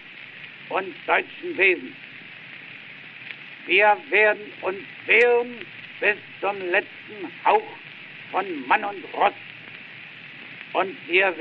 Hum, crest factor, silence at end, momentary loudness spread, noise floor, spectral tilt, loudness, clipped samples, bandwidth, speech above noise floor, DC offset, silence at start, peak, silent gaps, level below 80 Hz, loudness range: none; 22 dB; 0 s; 21 LU; -41 dBFS; -0.5 dB/octave; -22 LUFS; under 0.1%; 6.2 kHz; 19 dB; under 0.1%; 0 s; -4 dBFS; none; -72 dBFS; 5 LU